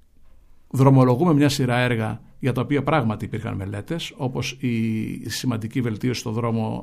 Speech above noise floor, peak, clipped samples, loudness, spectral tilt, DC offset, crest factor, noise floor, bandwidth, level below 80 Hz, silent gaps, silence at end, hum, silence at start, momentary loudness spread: 27 dB; -4 dBFS; under 0.1%; -22 LUFS; -6.5 dB/octave; under 0.1%; 18 dB; -48 dBFS; 15 kHz; -48 dBFS; none; 0 s; none; 0.75 s; 12 LU